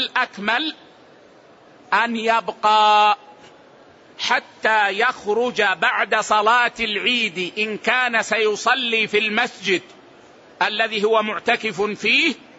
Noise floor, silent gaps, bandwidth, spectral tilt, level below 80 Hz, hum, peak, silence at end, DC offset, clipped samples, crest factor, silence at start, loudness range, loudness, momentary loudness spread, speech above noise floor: -49 dBFS; none; 8 kHz; -2.5 dB/octave; -66 dBFS; none; -4 dBFS; 0.25 s; under 0.1%; under 0.1%; 16 dB; 0 s; 2 LU; -19 LUFS; 6 LU; 29 dB